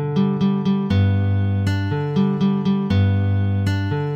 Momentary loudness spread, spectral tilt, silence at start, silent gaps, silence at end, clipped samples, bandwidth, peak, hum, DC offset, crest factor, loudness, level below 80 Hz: 3 LU; -8.5 dB/octave; 0 s; none; 0 s; under 0.1%; 7.2 kHz; -8 dBFS; none; under 0.1%; 10 dB; -20 LUFS; -50 dBFS